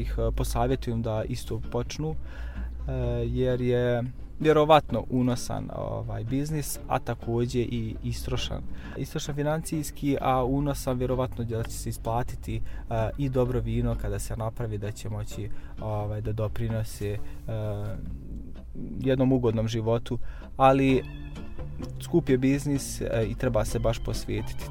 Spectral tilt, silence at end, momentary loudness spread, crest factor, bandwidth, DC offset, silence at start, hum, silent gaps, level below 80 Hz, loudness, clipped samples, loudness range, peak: -6.5 dB/octave; 0 s; 14 LU; 22 dB; 16.5 kHz; under 0.1%; 0 s; none; none; -38 dBFS; -28 LUFS; under 0.1%; 7 LU; -4 dBFS